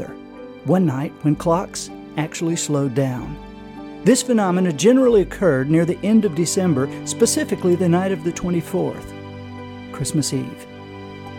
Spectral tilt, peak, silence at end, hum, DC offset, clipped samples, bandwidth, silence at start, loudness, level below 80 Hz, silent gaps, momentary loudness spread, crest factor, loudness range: -5.5 dB/octave; -2 dBFS; 0 s; none; under 0.1%; under 0.1%; 17.5 kHz; 0 s; -19 LUFS; -46 dBFS; none; 18 LU; 18 dB; 5 LU